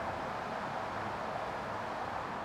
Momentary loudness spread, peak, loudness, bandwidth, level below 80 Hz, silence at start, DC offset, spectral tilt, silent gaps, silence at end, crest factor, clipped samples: 1 LU; -26 dBFS; -38 LUFS; 17.5 kHz; -60 dBFS; 0 s; under 0.1%; -5 dB/octave; none; 0 s; 12 dB; under 0.1%